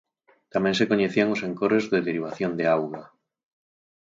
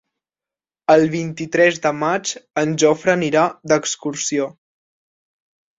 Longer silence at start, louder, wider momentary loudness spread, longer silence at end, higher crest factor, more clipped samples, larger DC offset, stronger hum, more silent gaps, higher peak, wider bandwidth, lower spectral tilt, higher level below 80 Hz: second, 0.55 s vs 0.9 s; second, -24 LUFS vs -18 LUFS; about the same, 8 LU vs 9 LU; second, 0.95 s vs 1.25 s; about the same, 18 dB vs 18 dB; neither; neither; neither; neither; second, -6 dBFS vs -2 dBFS; about the same, 7.8 kHz vs 8 kHz; first, -6 dB/octave vs -4 dB/octave; about the same, -64 dBFS vs -62 dBFS